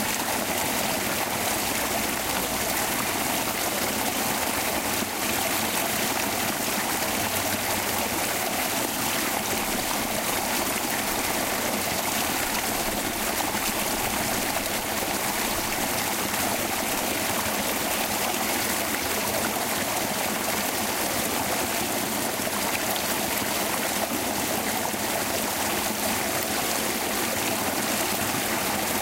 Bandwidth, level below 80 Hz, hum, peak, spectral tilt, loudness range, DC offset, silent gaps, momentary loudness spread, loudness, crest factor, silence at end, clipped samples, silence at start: 16 kHz; -50 dBFS; none; -10 dBFS; -2 dB/octave; 1 LU; under 0.1%; none; 1 LU; -25 LUFS; 16 dB; 0 s; under 0.1%; 0 s